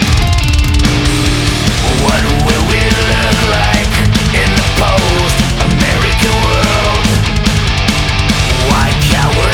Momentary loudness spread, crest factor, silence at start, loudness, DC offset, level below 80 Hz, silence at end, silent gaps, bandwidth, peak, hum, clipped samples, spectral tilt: 1 LU; 10 dB; 0 s; -11 LUFS; under 0.1%; -16 dBFS; 0 s; none; 18.5 kHz; 0 dBFS; none; under 0.1%; -4.5 dB/octave